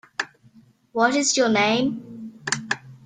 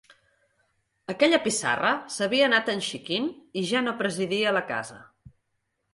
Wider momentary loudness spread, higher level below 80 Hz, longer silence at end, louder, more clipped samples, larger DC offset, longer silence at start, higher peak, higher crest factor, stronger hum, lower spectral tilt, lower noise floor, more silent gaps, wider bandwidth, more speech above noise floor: first, 15 LU vs 11 LU; about the same, -66 dBFS vs -70 dBFS; second, 0.1 s vs 0.65 s; first, -22 LUFS vs -25 LUFS; neither; neither; second, 0.2 s vs 1.1 s; first, -4 dBFS vs -8 dBFS; about the same, 20 dB vs 20 dB; neither; about the same, -2.5 dB/octave vs -3 dB/octave; second, -54 dBFS vs -77 dBFS; neither; second, 9.6 kHz vs 11.5 kHz; second, 34 dB vs 51 dB